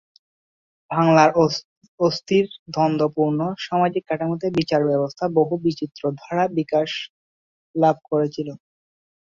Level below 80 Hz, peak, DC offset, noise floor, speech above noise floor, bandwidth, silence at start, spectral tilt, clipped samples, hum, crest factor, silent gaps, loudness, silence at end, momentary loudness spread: -62 dBFS; -2 dBFS; under 0.1%; under -90 dBFS; over 70 dB; 7.4 kHz; 0.9 s; -6.5 dB/octave; under 0.1%; none; 20 dB; 1.64-1.81 s, 1.88-1.98 s, 2.59-2.66 s, 7.10-7.74 s; -21 LUFS; 0.8 s; 10 LU